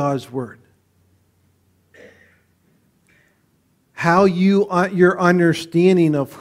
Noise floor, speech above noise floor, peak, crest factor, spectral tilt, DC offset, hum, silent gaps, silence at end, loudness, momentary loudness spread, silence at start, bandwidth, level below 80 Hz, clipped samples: -62 dBFS; 46 dB; 0 dBFS; 20 dB; -7 dB/octave; under 0.1%; none; none; 0 s; -16 LUFS; 12 LU; 0 s; 14.5 kHz; -60 dBFS; under 0.1%